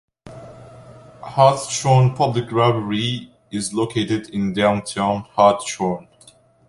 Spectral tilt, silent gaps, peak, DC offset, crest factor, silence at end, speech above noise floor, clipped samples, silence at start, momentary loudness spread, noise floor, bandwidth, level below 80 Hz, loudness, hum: -5.5 dB/octave; none; -2 dBFS; under 0.1%; 18 dB; 0.65 s; 33 dB; under 0.1%; 0.25 s; 15 LU; -51 dBFS; 11.5 kHz; -54 dBFS; -19 LUFS; none